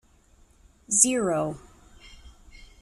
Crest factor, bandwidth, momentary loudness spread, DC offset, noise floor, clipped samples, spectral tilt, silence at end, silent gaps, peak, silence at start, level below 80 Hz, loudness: 26 dB; 14 kHz; 15 LU; under 0.1%; -58 dBFS; under 0.1%; -3 dB/octave; 0.25 s; none; -4 dBFS; 0.9 s; -54 dBFS; -22 LUFS